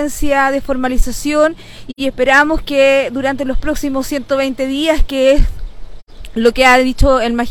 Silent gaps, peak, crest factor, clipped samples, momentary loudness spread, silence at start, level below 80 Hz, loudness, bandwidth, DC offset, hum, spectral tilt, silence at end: 6.02-6.06 s; 0 dBFS; 14 dB; under 0.1%; 10 LU; 0 s; -22 dBFS; -14 LUFS; 18 kHz; under 0.1%; none; -4.5 dB/octave; 0 s